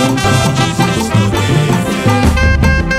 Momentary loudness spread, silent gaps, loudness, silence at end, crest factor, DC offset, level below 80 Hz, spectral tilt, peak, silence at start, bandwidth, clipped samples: 2 LU; none; -12 LUFS; 0 s; 10 dB; under 0.1%; -20 dBFS; -5.5 dB/octave; 0 dBFS; 0 s; 15.5 kHz; under 0.1%